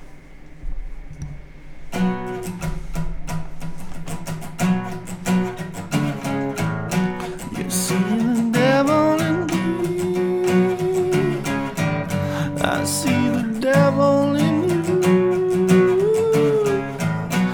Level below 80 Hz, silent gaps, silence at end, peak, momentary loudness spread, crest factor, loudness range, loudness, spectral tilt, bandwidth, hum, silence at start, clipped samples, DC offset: -38 dBFS; none; 0 s; -4 dBFS; 15 LU; 16 dB; 11 LU; -20 LUFS; -6 dB/octave; over 20 kHz; none; 0 s; under 0.1%; under 0.1%